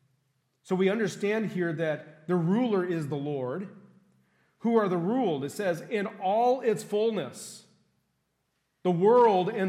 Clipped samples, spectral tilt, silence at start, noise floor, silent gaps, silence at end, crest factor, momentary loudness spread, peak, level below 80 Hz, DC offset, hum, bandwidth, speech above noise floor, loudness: under 0.1%; -6.5 dB/octave; 0.65 s; -77 dBFS; none; 0 s; 16 dB; 12 LU; -12 dBFS; -82 dBFS; under 0.1%; none; 15 kHz; 50 dB; -27 LUFS